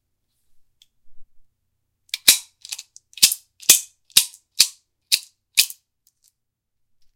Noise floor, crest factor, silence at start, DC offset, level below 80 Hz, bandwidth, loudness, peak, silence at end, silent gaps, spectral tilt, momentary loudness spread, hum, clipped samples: -77 dBFS; 24 dB; 1.05 s; under 0.1%; -64 dBFS; 17 kHz; -17 LUFS; 0 dBFS; 1.5 s; none; 3 dB/octave; 18 LU; none; under 0.1%